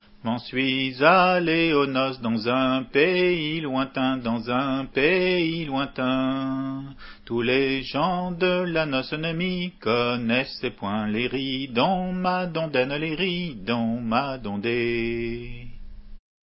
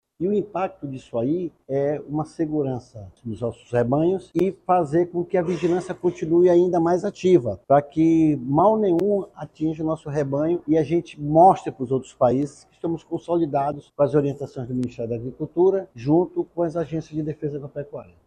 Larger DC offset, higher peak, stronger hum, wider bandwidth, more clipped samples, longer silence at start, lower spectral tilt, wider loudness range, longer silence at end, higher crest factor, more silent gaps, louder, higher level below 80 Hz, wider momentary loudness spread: neither; about the same, -2 dBFS vs -4 dBFS; neither; second, 5.8 kHz vs 9.4 kHz; neither; about the same, 0.25 s vs 0.2 s; first, -10 dB/octave vs -8.5 dB/octave; about the same, 4 LU vs 6 LU; about the same, 0.25 s vs 0.25 s; about the same, 22 dB vs 18 dB; neither; about the same, -24 LUFS vs -22 LUFS; first, -50 dBFS vs -56 dBFS; second, 9 LU vs 12 LU